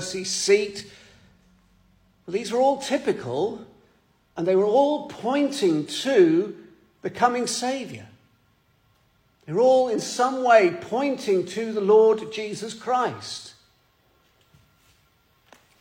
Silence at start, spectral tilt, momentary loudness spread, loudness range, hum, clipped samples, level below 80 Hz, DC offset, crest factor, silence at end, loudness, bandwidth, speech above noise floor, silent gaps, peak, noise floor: 0 s; -4 dB/octave; 17 LU; 7 LU; none; under 0.1%; -68 dBFS; under 0.1%; 20 dB; 2.3 s; -22 LUFS; 16.5 kHz; 42 dB; none; -4 dBFS; -64 dBFS